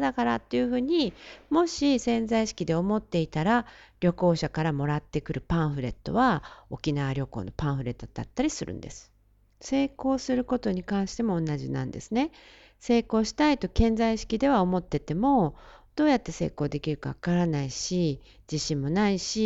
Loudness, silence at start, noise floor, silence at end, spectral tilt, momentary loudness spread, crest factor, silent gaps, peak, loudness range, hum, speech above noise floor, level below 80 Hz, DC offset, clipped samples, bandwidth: -27 LUFS; 0 s; -60 dBFS; 0 s; -6 dB/octave; 9 LU; 18 dB; none; -10 dBFS; 5 LU; none; 33 dB; -44 dBFS; under 0.1%; under 0.1%; 8.2 kHz